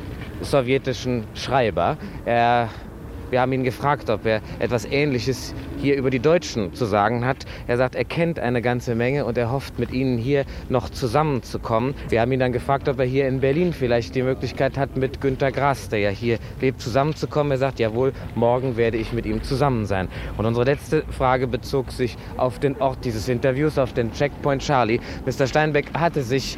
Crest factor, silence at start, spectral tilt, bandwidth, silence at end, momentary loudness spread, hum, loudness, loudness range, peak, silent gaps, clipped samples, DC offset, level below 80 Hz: 18 dB; 0 s; -6.5 dB/octave; 15.5 kHz; 0 s; 6 LU; none; -22 LUFS; 1 LU; -4 dBFS; none; under 0.1%; under 0.1%; -40 dBFS